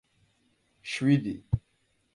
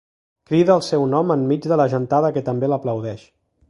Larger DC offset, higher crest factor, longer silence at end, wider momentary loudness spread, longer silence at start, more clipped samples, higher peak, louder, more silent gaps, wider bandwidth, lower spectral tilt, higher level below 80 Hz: neither; about the same, 18 dB vs 18 dB; about the same, 0.55 s vs 0.5 s; about the same, 11 LU vs 9 LU; first, 0.85 s vs 0.5 s; neither; second, -12 dBFS vs -2 dBFS; second, -29 LUFS vs -19 LUFS; neither; about the same, 11.5 kHz vs 11.5 kHz; about the same, -6.5 dB/octave vs -7.5 dB/octave; first, -50 dBFS vs -60 dBFS